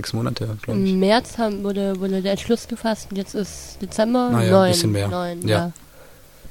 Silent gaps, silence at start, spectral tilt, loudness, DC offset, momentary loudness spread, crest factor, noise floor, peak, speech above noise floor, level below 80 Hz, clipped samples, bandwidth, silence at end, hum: none; 0 s; -5.5 dB/octave; -21 LUFS; 0.3%; 12 LU; 18 dB; -46 dBFS; -2 dBFS; 26 dB; -48 dBFS; under 0.1%; 17 kHz; 0 s; none